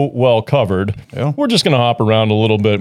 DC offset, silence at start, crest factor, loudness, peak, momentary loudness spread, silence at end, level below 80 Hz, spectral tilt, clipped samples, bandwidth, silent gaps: under 0.1%; 0 s; 14 dB; -14 LUFS; 0 dBFS; 7 LU; 0 s; -50 dBFS; -6 dB/octave; under 0.1%; 13.5 kHz; none